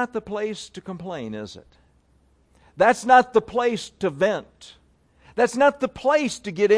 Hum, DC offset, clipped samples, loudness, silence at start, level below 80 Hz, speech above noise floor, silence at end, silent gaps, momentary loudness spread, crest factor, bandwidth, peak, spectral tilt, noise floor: none; under 0.1%; under 0.1%; -22 LUFS; 0 s; -58 dBFS; 39 dB; 0 s; none; 18 LU; 20 dB; 11 kHz; -4 dBFS; -4.5 dB/octave; -61 dBFS